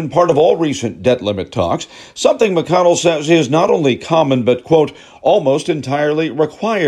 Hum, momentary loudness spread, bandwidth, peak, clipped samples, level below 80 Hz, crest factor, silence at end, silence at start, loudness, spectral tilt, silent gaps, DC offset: none; 7 LU; 11.5 kHz; -2 dBFS; under 0.1%; -52 dBFS; 14 dB; 0 s; 0 s; -14 LUFS; -5.5 dB/octave; none; under 0.1%